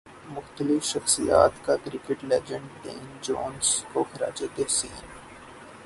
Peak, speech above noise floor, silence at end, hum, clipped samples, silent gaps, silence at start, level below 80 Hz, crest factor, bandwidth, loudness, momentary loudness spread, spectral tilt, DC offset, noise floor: -4 dBFS; 19 dB; 0 s; none; under 0.1%; none; 0.05 s; -54 dBFS; 24 dB; 12 kHz; -26 LUFS; 21 LU; -3 dB/octave; under 0.1%; -46 dBFS